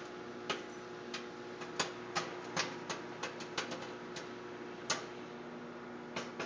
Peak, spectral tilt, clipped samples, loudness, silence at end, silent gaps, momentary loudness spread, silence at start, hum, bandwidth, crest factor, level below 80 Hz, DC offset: -20 dBFS; -2.5 dB/octave; under 0.1%; -42 LUFS; 0 s; none; 9 LU; 0 s; 60 Hz at -60 dBFS; 8 kHz; 24 dB; -74 dBFS; under 0.1%